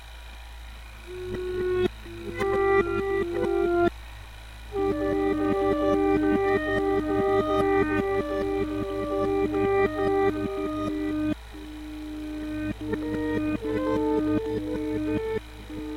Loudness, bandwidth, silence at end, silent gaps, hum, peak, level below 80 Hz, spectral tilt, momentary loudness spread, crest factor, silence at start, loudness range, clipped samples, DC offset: -26 LUFS; 15.5 kHz; 0 s; none; none; -12 dBFS; -42 dBFS; -7 dB/octave; 16 LU; 14 dB; 0 s; 5 LU; under 0.1%; under 0.1%